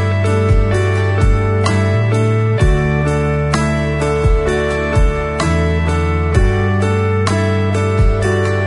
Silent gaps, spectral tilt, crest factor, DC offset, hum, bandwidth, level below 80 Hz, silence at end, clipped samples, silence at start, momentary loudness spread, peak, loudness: none; -7 dB/octave; 12 dB; under 0.1%; none; 11 kHz; -20 dBFS; 0 s; under 0.1%; 0 s; 2 LU; -2 dBFS; -15 LUFS